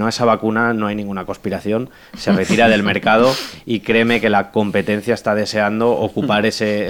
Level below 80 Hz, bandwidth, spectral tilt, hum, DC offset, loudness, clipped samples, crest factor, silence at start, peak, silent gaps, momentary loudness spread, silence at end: -50 dBFS; 17 kHz; -5.5 dB/octave; none; under 0.1%; -17 LUFS; under 0.1%; 16 dB; 0 s; -2 dBFS; none; 10 LU; 0 s